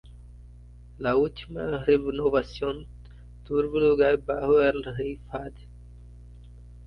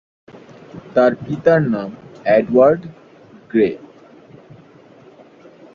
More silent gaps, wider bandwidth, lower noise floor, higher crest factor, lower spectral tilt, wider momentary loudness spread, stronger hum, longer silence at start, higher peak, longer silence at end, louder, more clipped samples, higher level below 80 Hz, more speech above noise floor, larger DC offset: neither; second, 6 kHz vs 7 kHz; about the same, -47 dBFS vs -45 dBFS; about the same, 18 dB vs 18 dB; about the same, -8 dB/octave vs -8.5 dB/octave; second, 15 LU vs 22 LU; first, 60 Hz at -45 dBFS vs none; second, 0.05 s vs 0.75 s; second, -10 dBFS vs -2 dBFS; second, 0 s vs 1.95 s; second, -26 LUFS vs -16 LUFS; neither; first, -46 dBFS vs -56 dBFS; second, 22 dB vs 30 dB; neither